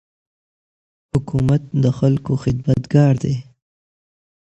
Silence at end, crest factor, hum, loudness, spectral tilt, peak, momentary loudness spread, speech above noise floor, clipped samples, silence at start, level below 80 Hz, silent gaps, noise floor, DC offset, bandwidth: 1.1 s; 18 dB; none; -18 LUFS; -9 dB/octave; -2 dBFS; 9 LU; over 73 dB; under 0.1%; 1.15 s; -44 dBFS; none; under -90 dBFS; under 0.1%; 8.2 kHz